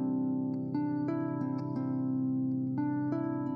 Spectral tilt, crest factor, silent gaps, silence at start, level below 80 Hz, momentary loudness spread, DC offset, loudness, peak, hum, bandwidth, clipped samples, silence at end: -11.5 dB/octave; 10 dB; none; 0 s; -72 dBFS; 2 LU; under 0.1%; -33 LUFS; -22 dBFS; none; 5.2 kHz; under 0.1%; 0 s